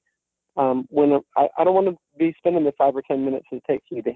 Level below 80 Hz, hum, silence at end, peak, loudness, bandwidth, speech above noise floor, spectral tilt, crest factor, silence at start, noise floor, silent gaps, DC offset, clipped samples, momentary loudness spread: -66 dBFS; none; 0 s; -6 dBFS; -21 LUFS; 4.1 kHz; 56 dB; -10 dB/octave; 14 dB; 0.55 s; -77 dBFS; none; under 0.1%; under 0.1%; 8 LU